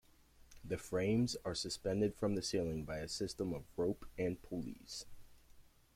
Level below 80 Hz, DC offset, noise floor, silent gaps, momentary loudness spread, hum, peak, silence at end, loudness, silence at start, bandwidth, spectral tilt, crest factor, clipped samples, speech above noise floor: -60 dBFS; under 0.1%; -65 dBFS; none; 11 LU; none; -24 dBFS; 0.35 s; -40 LUFS; 0.5 s; 16.5 kHz; -5 dB/octave; 16 dB; under 0.1%; 26 dB